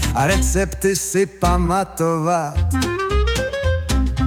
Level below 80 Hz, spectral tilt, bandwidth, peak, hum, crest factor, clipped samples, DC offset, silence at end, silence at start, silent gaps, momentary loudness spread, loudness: -24 dBFS; -5 dB/octave; 17 kHz; -4 dBFS; none; 14 dB; under 0.1%; under 0.1%; 0 s; 0 s; none; 3 LU; -19 LUFS